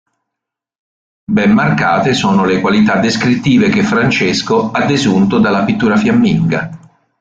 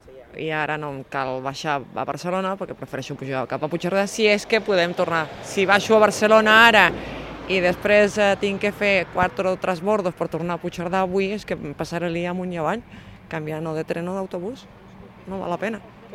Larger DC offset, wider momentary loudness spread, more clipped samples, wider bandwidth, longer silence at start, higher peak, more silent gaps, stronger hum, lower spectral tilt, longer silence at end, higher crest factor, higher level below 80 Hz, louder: neither; second, 3 LU vs 15 LU; neither; second, 7.8 kHz vs 16 kHz; first, 1.3 s vs 0.05 s; about the same, -2 dBFS vs 0 dBFS; neither; neither; first, -6 dB/octave vs -4.5 dB/octave; first, 0.45 s vs 0 s; second, 12 dB vs 22 dB; first, -46 dBFS vs -52 dBFS; first, -12 LUFS vs -21 LUFS